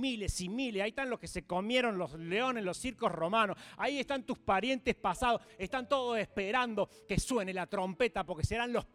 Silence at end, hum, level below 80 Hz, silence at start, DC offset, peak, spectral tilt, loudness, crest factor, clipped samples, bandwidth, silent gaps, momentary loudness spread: 0.1 s; none; -52 dBFS; 0 s; under 0.1%; -16 dBFS; -4.5 dB/octave; -34 LUFS; 18 dB; under 0.1%; 16 kHz; none; 6 LU